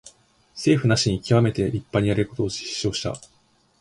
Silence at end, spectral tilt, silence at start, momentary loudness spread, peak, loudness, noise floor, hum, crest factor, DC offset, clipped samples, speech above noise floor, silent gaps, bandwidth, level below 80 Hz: 0.6 s; -5.5 dB/octave; 0.05 s; 10 LU; -6 dBFS; -23 LUFS; -55 dBFS; none; 18 dB; under 0.1%; under 0.1%; 33 dB; none; 11.5 kHz; -46 dBFS